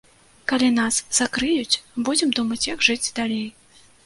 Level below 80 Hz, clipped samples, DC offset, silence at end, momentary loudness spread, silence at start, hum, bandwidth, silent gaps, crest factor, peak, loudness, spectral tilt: -54 dBFS; under 0.1%; under 0.1%; 0.55 s; 7 LU; 0.5 s; none; 11.5 kHz; none; 20 dB; -2 dBFS; -21 LUFS; -1.5 dB/octave